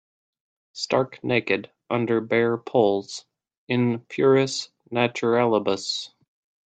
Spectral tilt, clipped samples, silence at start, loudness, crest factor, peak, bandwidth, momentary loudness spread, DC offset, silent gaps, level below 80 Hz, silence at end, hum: -5 dB/octave; under 0.1%; 0.75 s; -23 LUFS; 20 dB; -4 dBFS; 9 kHz; 10 LU; under 0.1%; 3.57-3.67 s; -68 dBFS; 0.6 s; none